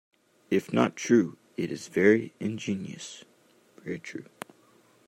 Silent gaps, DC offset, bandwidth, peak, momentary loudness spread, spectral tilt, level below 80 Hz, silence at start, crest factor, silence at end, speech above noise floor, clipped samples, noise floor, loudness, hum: none; under 0.1%; 14.5 kHz; -6 dBFS; 22 LU; -5.5 dB/octave; -74 dBFS; 0.5 s; 22 dB; 0.85 s; 34 dB; under 0.1%; -61 dBFS; -28 LUFS; none